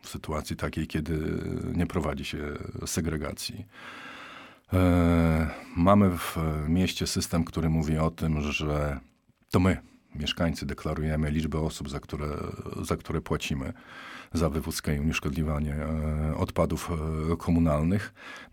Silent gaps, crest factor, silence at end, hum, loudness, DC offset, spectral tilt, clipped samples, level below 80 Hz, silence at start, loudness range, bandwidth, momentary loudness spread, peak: none; 20 dB; 0.05 s; none; -29 LUFS; under 0.1%; -6 dB/octave; under 0.1%; -40 dBFS; 0.05 s; 7 LU; 18 kHz; 12 LU; -8 dBFS